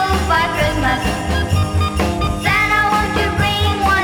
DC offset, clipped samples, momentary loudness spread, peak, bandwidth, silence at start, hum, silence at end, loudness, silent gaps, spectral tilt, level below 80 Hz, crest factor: under 0.1%; under 0.1%; 5 LU; -2 dBFS; 18 kHz; 0 s; none; 0 s; -16 LUFS; none; -5 dB/octave; -26 dBFS; 14 dB